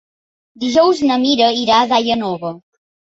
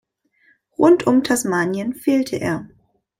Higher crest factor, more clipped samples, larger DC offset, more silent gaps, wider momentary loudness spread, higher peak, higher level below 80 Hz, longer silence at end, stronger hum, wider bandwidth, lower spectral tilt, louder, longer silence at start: about the same, 14 dB vs 18 dB; neither; neither; neither; about the same, 11 LU vs 10 LU; about the same, -2 dBFS vs -2 dBFS; about the same, -56 dBFS vs -56 dBFS; about the same, 0.5 s vs 0.55 s; neither; second, 8 kHz vs 16 kHz; about the same, -4 dB/octave vs -5 dB/octave; first, -15 LUFS vs -18 LUFS; second, 0.6 s vs 0.8 s